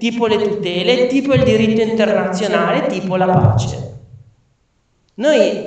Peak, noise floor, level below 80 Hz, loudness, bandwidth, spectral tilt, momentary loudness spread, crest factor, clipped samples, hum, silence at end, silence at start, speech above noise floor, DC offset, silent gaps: 0 dBFS; -61 dBFS; -44 dBFS; -15 LUFS; 8.8 kHz; -6.5 dB/octave; 6 LU; 16 dB; under 0.1%; none; 0 s; 0 s; 47 dB; under 0.1%; none